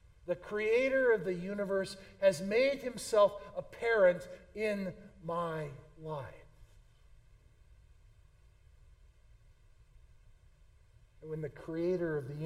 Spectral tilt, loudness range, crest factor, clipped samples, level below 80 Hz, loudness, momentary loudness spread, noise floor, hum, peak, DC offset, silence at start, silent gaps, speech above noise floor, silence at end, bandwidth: -5.5 dB/octave; 19 LU; 20 dB; under 0.1%; -62 dBFS; -33 LUFS; 16 LU; -62 dBFS; none; -16 dBFS; under 0.1%; 0.25 s; none; 29 dB; 0 s; 15.5 kHz